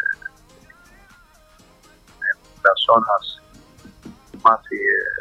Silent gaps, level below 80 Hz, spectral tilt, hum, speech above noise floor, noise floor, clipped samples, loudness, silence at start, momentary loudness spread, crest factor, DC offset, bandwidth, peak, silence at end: none; -56 dBFS; -3.5 dB/octave; none; 34 dB; -51 dBFS; under 0.1%; -19 LUFS; 0 s; 19 LU; 20 dB; under 0.1%; 13 kHz; -2 dBFS; 0 s